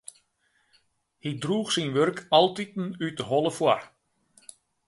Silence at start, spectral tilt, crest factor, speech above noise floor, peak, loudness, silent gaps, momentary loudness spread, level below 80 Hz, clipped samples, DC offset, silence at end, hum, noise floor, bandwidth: 1.25 s; -4.5 dB/octave; 22 dB; 45 dB; -6 dBFS; -26 LUFS; none; 12 LU; -70 dBFS; under 0.1%; under 0.1%; 1 s; none; -70 dBFS; 11.5 kHz